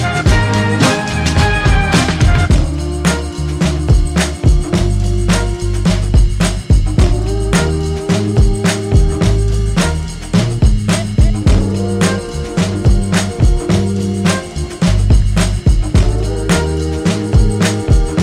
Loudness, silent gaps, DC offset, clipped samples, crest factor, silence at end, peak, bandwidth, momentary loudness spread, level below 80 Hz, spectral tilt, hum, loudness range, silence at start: -14 LUFS; none; under 0.1%; under 0.1%; 12 dB; 0 s; 0 dBFS; 13.5 kHz; 5 LU; -16 dBFS; -5.5 dB/octave; none; 1 LU; 0 s